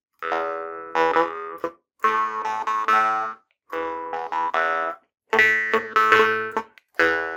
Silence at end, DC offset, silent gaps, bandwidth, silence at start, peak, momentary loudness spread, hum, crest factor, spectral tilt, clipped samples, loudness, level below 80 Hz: 0 s; under 0.1%; none; 19.5 kHz; 0.2 s; 0 dBFS; 15 LU; none; 22 dB; -3 dB/octave; under 0.1%; -22 LUFS; -66 dBFS